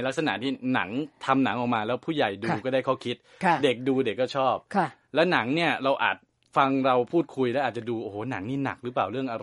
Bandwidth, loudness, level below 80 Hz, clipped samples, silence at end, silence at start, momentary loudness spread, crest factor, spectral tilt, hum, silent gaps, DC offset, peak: 11.5 kHz; -26 LUFS; -70 dBFS; under 0.1%; 0 s; 0 s; 8 LU; 20 dB; -6 dB/octave; none; none; under 0.1%; -6 dBFS